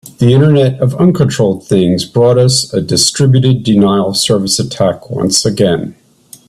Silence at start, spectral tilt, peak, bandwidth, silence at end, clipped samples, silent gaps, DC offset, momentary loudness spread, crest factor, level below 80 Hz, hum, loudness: 0.05 s; -5.5 dB/octave; 0 dBFS; 13 kHz; 0.55 s; under 0.1%; none; under 0.1%; 5 LU; 10 dB; -44 dBFS; none; -11 LUFS